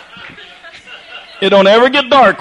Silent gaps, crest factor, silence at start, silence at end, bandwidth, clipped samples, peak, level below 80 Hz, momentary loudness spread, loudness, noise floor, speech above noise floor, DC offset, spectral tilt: none; 12 dB; 0.2 s; 0 s; 9.8 kHz; under 0.1%; 0 dBFS; -52 dBFS; 24 LU; -9 LUFS; -35 dBFS; 25 dB; under 0.1%; -5 dB/octave